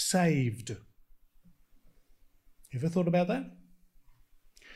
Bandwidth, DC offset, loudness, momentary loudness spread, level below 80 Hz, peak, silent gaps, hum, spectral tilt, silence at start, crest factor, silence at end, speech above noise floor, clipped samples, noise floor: 15 kHz; under 0.1%; -30 LUFS; 17 LU; -62 dBFS; -14 dBFS; none; none; -5.5 dB/octave; 0 s; 20 dB; 0 s; 31 dB; under 0.1%; -61 dBFS